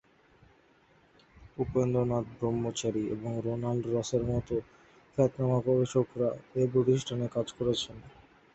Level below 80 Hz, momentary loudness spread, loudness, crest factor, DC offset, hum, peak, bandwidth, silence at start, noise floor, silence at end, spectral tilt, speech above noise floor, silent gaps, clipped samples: -56 dBFS; 8 LU; -31 LUFS; 20 dB; under 0.1%; none; -12 dBFS; 8.2 kHz; 1.4 s; -63 dBFS; 0.45 s; -6.5 dB/octave; 34 dB; none; under 0.1%